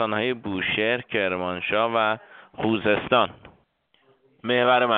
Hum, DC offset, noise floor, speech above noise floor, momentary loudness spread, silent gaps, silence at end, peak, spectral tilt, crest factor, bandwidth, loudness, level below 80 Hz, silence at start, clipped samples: none; under 0.1%; -65 dBFS; 42 dB; 8 LU; none; 0 s; -6 dBFS; -2 dB/octave; 20 dB; 4.6 kHz; -23 LUFS; -60 dBFS; 0 s; under 0.1%